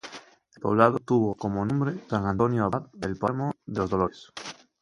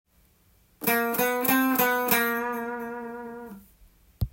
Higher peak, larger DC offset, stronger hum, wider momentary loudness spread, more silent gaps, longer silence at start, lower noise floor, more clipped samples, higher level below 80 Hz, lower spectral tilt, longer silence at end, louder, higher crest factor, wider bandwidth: first, -2 dBFS vs -8 dBFS; neither; neither; about the same, 18 LU vs 17 LU; neither; second, 0.05 s vs 0.8 s; second, -48 dBFS vs -62 dBFS; neither; about the same, -52 dBFS vs -48 dBFS; first, -7.5 dB/octave vs -4 dB/octave; first, 0.3 s vs 0.05 s; about the same, -26 LUFS vs -25 LUFS; about the same, 24 dB vs 20 dB; second, 11.5 kHz vs 17 kHz